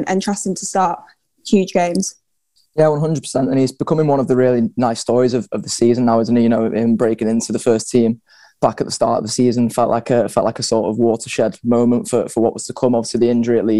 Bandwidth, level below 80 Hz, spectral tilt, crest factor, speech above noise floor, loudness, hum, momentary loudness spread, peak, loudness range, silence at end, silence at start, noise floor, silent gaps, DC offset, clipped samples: 12.5 kHz; -54 dBFS; -5.5 dB/octave; 16 dB; 47 dB; -17 LUFS; none; 5 LU; 0 dBFS; 2 LU; 0 s; 0 s; -63 dBFS; none; 0.4%; under 0.1%